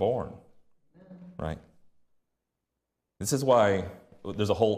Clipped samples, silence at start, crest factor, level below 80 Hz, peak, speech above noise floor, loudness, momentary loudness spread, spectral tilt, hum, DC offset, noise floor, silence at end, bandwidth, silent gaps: under 0.1%; 0 s; 20 dB; -58 dBFS; -10 dBFS; 58 dB; -28 LUFS; 20 LU; -5 dB/octave; none; under 0.1%; -85 dBFS; 0 s; 15 kHz; none